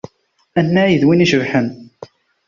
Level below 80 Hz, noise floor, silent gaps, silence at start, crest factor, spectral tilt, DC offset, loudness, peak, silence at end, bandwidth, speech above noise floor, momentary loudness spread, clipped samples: -52 dBFS; -58 dBFS; none; 0.55 s; 14 dB; -6.5 dB/octave; under 0.1%; -15 LUFS; -2 dBFS; 0.45 s; 7.4 kHz; 44 dB; 11 LU; under 0.1%